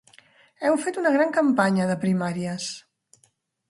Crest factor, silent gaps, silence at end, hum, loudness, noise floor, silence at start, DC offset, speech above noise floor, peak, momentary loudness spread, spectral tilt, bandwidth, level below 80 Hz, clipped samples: 20 dB; none; 0.9 s; none; -23 LUFS; -66 dBFS; 0.6 s; under 0.1%; 44 dB; -6 dBFS; 10 LU; -6 dB/octave; 11.5 kHz; -70 dBFS; under 0.1%